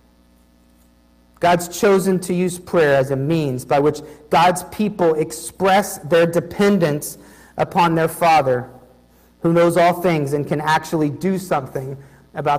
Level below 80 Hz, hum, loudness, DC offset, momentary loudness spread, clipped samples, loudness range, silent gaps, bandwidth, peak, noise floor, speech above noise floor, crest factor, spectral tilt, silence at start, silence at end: -52 dBFS; 60 Hz at -50 dBFS; -18 LUFS; under 0.1%; 10 LU; under 0.1%; 1 LU; none; 15.5 kHz; -6 dBFS; -53 dBFS; 36 dB; 14 dB; -5.5 dB/octave; 1.4 s; 0 s